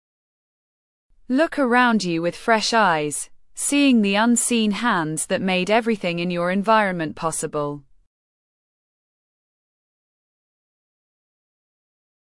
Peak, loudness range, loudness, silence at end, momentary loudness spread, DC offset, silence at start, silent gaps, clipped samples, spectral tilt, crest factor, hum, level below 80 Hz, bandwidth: -4 dBFS; 11 LU; -20 LUFS; 4.5 s; 9 LU; under 0.1%; 1.3 s; none; under 0.1%; -4 dB/octave; 18 dB; none; -58 dBFS; 12 kHz